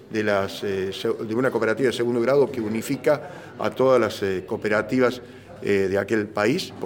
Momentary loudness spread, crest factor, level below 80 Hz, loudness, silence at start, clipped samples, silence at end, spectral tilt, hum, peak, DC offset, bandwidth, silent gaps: 7 LU; 16 dB; -62 dBFS; -23 LUFS; 0 s; under 0.1%; 0 s; -5.5 dB/octave; none; -6 dBFS; under 0.1%; 17 kHz; none